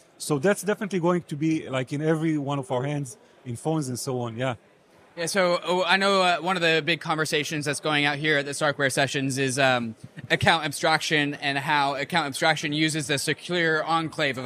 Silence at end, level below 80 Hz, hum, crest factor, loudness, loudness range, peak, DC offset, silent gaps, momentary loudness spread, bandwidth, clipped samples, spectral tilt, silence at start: 0 s; -66 dBFS; none; 20 dB; -24 LUFS; 5 LU; -4 dBFS; under 0.1%; none; 8 LU; 15.5 kHz; under 0.1%; -4 dB/octave; 0.2 s